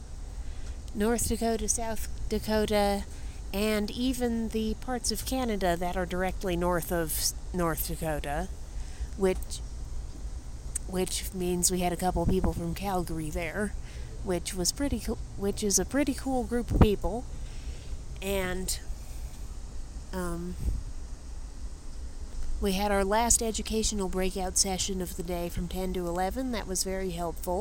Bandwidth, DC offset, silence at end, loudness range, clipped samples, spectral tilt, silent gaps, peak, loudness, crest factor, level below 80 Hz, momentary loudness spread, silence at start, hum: 17 kHz; under 0.1%; 0 s; 7 LU; under 0.1%; -4 dB/octave; none; -6 dBFS; -30 LUFS; 24 dB; -36 dBFS; 16 LU; 0 s; none